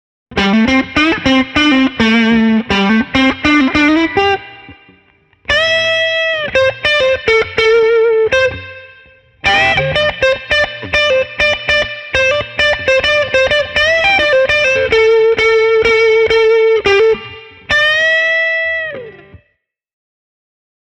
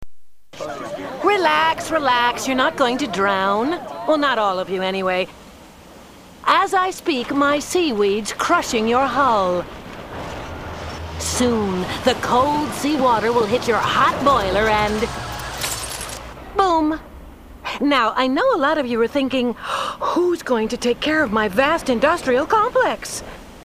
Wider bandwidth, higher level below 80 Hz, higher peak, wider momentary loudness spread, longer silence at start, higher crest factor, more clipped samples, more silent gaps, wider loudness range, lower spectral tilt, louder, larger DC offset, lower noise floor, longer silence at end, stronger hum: second, 10 kHz vs 15.5 kHz; about the same, -38 dBFS vs -42 dBFS; first, 0 dBFS vs -4 dBFS; second, 5 LU vs 13 LU; first, 0.3 s vs 0 s; about the same, 12 dB vs 16 dB; neither; neither; about the same, 3 LU vs 3 LU; about the same, -4.5 dB/octave vs -4 dB/octave; first, -11 LUFS vs -19 LUFS; neither; first, -64 dBFS vs -42 dBFS; first, 1.75 s vs 0 s; neither